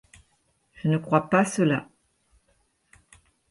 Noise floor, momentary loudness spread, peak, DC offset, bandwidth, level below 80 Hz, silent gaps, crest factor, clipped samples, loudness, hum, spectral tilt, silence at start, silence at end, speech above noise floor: -69 dBFS; 8 LU; -6 dBFS; under 0.1%; 11.5 kHz; -64 dBFS; none; 22 dB; under 0.1%; -24 LUFS; none; -6.5 dB/octave; 0.85 s; 1.65 s; 46 dB